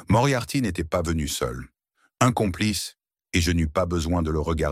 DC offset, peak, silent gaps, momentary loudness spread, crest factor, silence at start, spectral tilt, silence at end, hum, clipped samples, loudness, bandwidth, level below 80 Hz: under 0.1%; -4 dBFS; none; 7 LU; 20 dB; 0 s; -5 dB/octave; 0 s; none; under 0.1%; -24 LUFS; 16 kHz; -36 dBFS